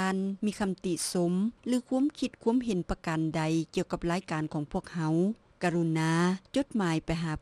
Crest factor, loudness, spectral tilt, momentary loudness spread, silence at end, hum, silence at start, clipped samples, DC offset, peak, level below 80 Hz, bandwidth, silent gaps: 16 dB; -30 LUFS; -6 dB/octave; 5 LU; 0.05 s; none; 0 s; under 0.1%; under 0.1%; -14 dBFS; -52 dBFS; 13 kHz; none